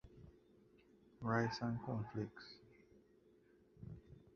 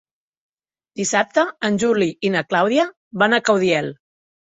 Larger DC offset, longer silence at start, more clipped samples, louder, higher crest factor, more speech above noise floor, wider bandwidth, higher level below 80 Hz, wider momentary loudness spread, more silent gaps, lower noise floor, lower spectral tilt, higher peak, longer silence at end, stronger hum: neither; second, 0.05 s vs 0.95 s; neither; second, -43 LUFS vs -19 LUFS; first, 24 dB vs 18 dB; second, 29 dB vs 37 dB; second, 6.8 kHz vs 8.4 kHz; second, -70 dBFS vs -62 dBFS; first, 24 LU vs 7 LU; second, none vs 2.97-3.11 s; first, -70 dBFS vs -55 dBFS; first, -5.5 dB/octave vs -4 dB/octave; second, -22 dBFS vs -2 dBFS; second, 0.15 s vs 0.5 s; neither